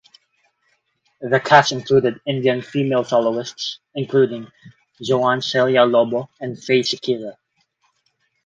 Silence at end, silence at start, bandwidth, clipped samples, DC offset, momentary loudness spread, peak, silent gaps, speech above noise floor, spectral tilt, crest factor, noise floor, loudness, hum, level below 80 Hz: 1.15 s; 1.2 s; 7.8 kHz; under 0.1%; under 0.1%; 15 LU; 0 dBFS; none; 49 dB; -5 dB/octave; 20 dB; -68 dBFS; -18 LUFS; none; -62 dBFS